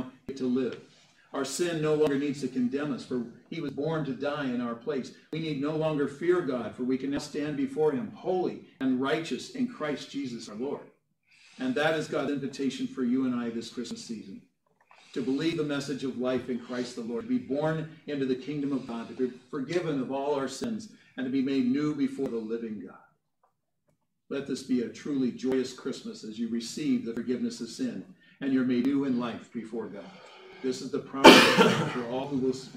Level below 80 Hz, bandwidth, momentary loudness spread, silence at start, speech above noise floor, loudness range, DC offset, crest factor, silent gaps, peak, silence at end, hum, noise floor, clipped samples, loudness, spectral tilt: -68 dBFS; 16 kHz; 11 LU; 0 s; 47 dB; 4 LU; under 0.1%; 28 dB; none; 0 dBFS; 0 s; none; -76 dBFS; under 0.1%; -29 LUFS; -4.5 dB/octave